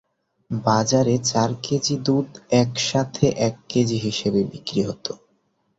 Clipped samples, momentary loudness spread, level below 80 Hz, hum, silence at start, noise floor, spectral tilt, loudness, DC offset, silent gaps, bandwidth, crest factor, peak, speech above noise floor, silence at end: under 0.1%; 7 LU; -54 dBFS; none; 0.5 s; -67 dBFS; -5 dB/octave; -22 LUFS; under 0.1%; none; 8 kHz; 18 dB; -4 dBFS; 46 dB; 0.65 s